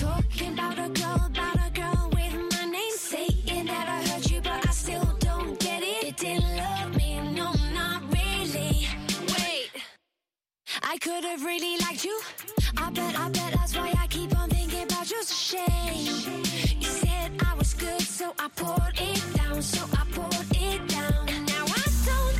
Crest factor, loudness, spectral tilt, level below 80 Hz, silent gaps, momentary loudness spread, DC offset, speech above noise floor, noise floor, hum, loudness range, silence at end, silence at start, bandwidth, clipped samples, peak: 14 dB; -28 LUFS; -4 dB/octave; -32 dBFS; none; 3 LU; under 0.1%; over 62 dB; under -90 dBFS; none; 2 LU; 0 s; 0 s; 16 kHz; under 0.1%; -14 dBFS